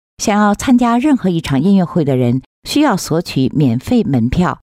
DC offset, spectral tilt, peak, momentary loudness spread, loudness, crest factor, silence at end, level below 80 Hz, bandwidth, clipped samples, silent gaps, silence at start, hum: under 0.1%; -6 dB/octave; -4 dBFS; 5 LU; -14 LUFS; 10 dB; 0.05 s; -38 dBFS; 16 kHz; under 0.1%; 2.46-2.62 s; 0.2 s; none